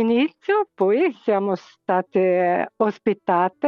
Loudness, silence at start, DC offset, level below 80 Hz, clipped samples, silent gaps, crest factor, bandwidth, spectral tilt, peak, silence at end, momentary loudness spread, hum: -21 LUFS; 0 s; under 0.1%; -72 dBFS; under 0.1%; none; 12 dB; 6.6 kHz; -8 dB/octave; -8 dBFS; 0 s; 5 LU; none